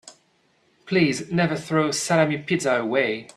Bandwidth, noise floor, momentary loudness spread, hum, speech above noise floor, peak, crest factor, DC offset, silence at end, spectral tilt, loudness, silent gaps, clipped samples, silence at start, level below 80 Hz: 13 kHz; -64 dBFS; 3 LU; none; 42 dB; -6 dBFS; 18 dB; under 0.1%; 0.15 s; -5 dB/octave; -22 LUFS; none; under 0.1%; 0.05 s; -62 dBFS